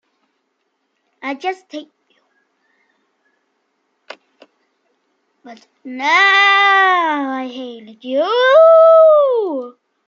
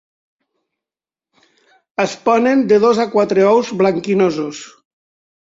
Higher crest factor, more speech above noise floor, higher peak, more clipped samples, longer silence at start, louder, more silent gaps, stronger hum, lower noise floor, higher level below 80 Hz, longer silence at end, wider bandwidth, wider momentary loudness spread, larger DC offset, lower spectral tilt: about the same, 14 dB vs 16 dB; second, 56 dB vs 76 dB; about the same, -2 dBFS vs -2 dBFS; neither; second, 1.25 s vs 2 s; first, -12 LUFS vs -15 LUFS; neither; neither; second, -69 dBFS vs -90 dBFS; second, -82 dBFS vs -62 dBFS; second, 0.4 s vs 0.75 s; about the same, 7.2 kHz vs 7.8 kHz; first, 25 LU vs 12 LU; neither; second, -1.5 dB/octave vs -6 dB/octave